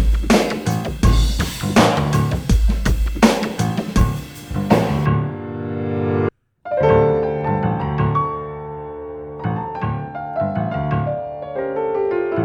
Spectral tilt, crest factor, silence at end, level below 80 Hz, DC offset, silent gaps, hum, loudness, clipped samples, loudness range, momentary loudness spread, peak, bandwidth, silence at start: -6.5 dB/octave; 18 dB; 0 s; -24 dBFS; under 0.1%; none; none; -19 LUFS; under 0.1%; 6 LU; 12 LU; 0 dBFS; over 20 kHz; 0 s